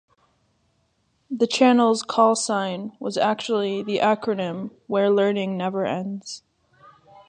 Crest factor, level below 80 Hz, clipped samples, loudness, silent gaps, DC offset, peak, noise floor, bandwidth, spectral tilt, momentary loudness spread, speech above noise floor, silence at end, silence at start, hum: 20 dB; -72 dBFS; under 0.1%; -22 LUFS; none; under 0.1%; -4 dBFS; -68 dBFS; 10 kHz; -4.5 dB/octave; 13 LU; 46 dB; 0.9 s; 1.3 s; none